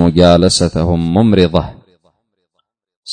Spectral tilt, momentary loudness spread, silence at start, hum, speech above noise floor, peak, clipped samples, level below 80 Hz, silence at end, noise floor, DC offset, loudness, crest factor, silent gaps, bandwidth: -6 dB/octave; 8 LU; 0 s; none; 58 dB; 0 dBFS; under 0.1%; -32 dBFS; 0 s; -69 dBFS; under 0.1%; -11 LUFS; 14 dB; 2.96-3.03 s; 9.6 kHz